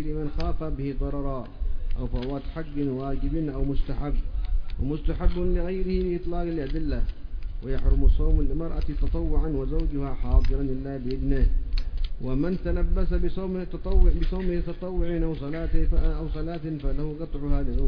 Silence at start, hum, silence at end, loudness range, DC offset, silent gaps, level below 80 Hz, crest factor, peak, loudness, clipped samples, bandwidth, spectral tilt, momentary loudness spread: 0 s; none; 0 s; 3 LU; under 0.1%; none; -24 dBFS; 16 dB; -6 dBFS; -29 LUFS; under 0.1%; 5.2 kHz; -10 dB/octave; 8 LU